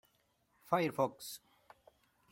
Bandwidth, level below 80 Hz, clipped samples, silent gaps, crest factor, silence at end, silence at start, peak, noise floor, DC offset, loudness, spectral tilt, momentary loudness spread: 16.5 kHz; -80 dBFS; under 0.1%; none; 24 dB; 0.95 s; 0.7 s; -16 dBFS; -76 dBFS; under 0.1%; -37 LUFS; -5 dB/octave; 15 LU